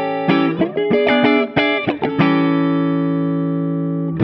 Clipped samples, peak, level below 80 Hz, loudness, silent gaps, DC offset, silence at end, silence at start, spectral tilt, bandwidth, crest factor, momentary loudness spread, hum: under 0.1%; -2 dBFS; -54 dBFS; -17 LUFS; none; under 0.1%; 0 s; 0 s; -9 dB/octave; 5.8 kHz; 14 dB; 6 LU; none